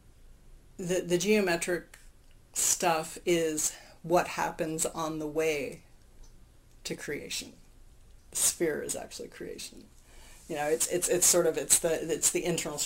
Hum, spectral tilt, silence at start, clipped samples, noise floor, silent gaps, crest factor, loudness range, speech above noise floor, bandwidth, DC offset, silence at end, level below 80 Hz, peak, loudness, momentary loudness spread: none; -2.5 dB/octave; 0.2 s; under 0.1%; -55 dBFS; none; 26 dB; 7 LU; 25 dB; 16 kHz; under 0.1%; 0 s; -56 dBFS; -6 dBFS; -28 LUFS; 16 LU